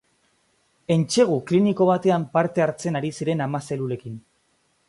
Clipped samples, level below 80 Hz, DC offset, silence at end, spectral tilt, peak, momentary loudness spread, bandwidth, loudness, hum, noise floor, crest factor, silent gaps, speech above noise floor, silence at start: under 0.1%; -64 dBFS; under 0.1%; 0.7 s; -6 dB/octave; -4 dBFS; 12 LU; 11.5 kHz; -22 LUFS; none; -67 dBFS; 18 dB; none; 45 dB; 0.9 s